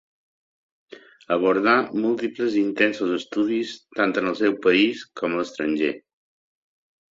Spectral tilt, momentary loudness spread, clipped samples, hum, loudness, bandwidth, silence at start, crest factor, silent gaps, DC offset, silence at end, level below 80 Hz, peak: -5.5 dB/octave; 8 LU; under 0.1%; none; -22 LUFS; 7.8 kHz; 0.9 s; 20 dB; none; under 0.1%; 1.1 s; -66 dBFS; -4 dBFS